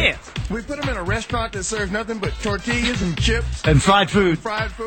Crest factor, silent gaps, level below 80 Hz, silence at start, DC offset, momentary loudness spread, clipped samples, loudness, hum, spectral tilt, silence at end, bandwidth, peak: 18 dB; none; -30 dBFS; 0 s; under 0.1%; 10 LU; under 0.1%; -21 LUFS; none; -4.5 dB/octave; 0 s; 17 kHz; -2 dBFS